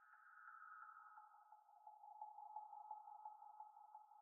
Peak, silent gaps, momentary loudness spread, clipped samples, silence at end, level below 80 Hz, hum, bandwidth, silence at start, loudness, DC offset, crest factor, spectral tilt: -42 dBFS; none; 9 LU; under 0.1%; 0 s; under -90 dBFS; none; 2 kHz; 0 s; -61 LUFS; under 0.1%; 18 dB; 11 dB/octave